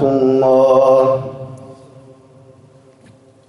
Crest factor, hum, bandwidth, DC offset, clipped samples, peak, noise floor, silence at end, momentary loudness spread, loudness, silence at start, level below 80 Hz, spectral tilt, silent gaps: 16 dB; none; 11 kHz; under 0.1%; under 0.1%; 0 dBFS; -46 dBFS; 1.75 s; 21 LU; -12 LUFS; 0 s; -56 dBFS; -8 dB/octave; none